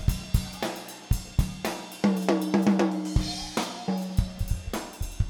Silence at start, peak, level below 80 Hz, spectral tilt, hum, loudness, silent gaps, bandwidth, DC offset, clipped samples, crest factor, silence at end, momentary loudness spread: 0 s; -6 dBFS; -34 dBFS; -5.5 dB/octave; none; -28 LUFS; none; 19 kHz; under 0.1%; under 0.1%; 20 dB; 0 s; 10 LU